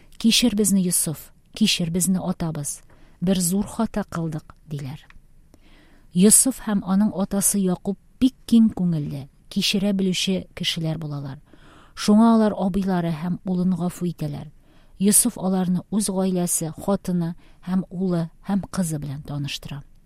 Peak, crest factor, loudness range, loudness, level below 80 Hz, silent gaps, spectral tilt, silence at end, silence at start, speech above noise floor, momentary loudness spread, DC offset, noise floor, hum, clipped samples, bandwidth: 0 dBFS; 22 dB; 6 LU; -22 LUFS; -48 dBFS; none; -4.5 dB/octave; 0.2 s; 0.1 s; 29 dB; 15 LU; under 0.1%; -50 dBFS; none; under 0.1%; 16 kHz